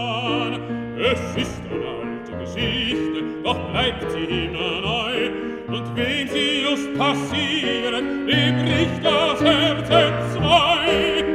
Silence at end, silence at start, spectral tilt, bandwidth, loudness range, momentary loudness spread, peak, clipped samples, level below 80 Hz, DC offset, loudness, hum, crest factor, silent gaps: 0 s; 0 s; -5 dB/octave; 13.5 kHz; 6 LU; 11 LU; -2 dBFS; under 0.1%; -42 dBFS; under 0.1%; -21 LUFS; none; 20 dB; none